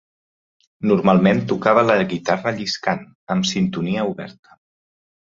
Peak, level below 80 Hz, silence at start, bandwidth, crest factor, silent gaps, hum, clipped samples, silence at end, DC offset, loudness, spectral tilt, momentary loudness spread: -2 dBFS; -56 dBFS; 0.8 s; 7.6 kHz; 18 dB; 3.15-3.27 s; none; under 0.1%; 0.9 s; under 0.1%; -19 LUFS; -6 dB/octave; 11 LU